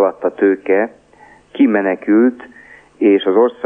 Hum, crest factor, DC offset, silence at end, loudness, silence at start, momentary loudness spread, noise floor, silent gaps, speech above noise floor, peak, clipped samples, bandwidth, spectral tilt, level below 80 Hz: none; 14 dB; under 0.1%; 0 s; -15 LUFS; 0 s; 7 LU; -46 dBFS; none; 32 dB; -2 dBFS; under 0.1%; 3.7 kHz; -8 dB/octave; -64 dBFS